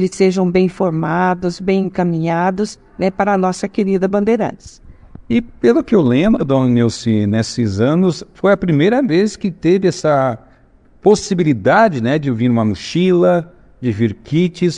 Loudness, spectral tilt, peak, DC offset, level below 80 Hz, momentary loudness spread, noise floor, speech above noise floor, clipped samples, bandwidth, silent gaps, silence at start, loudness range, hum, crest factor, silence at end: -15 LUFS; -7 dB/octave; 0 dBFS; under 0.1%; -44 dBFS; 6 LU; -48 dBFS; 34 dB; under 0.1%; 10.5 kHz; none; 0 s; 2 LU; none; 14 dB; 0 s